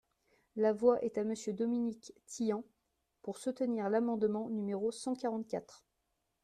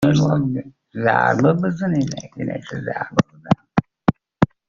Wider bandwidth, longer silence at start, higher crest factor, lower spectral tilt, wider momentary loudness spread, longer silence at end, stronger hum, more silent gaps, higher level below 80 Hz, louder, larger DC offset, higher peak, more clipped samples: first, 13 kHz vs 7.4 kHz; first, 0.55 s vs 0 s; about the same, 20 dB vs 18 dB; about the same, -6 dB/octave vs -6.5 dB/octave; about the same, 12 LU vs 11 LU; first, 0.7 s vs 0.25 s; neither; neither; second, -76 dBFS vs -48 dBFS; second, -35 LUFS vs -21 LUFS; neither; second, -16 dBFS vs -2 dBFS; neither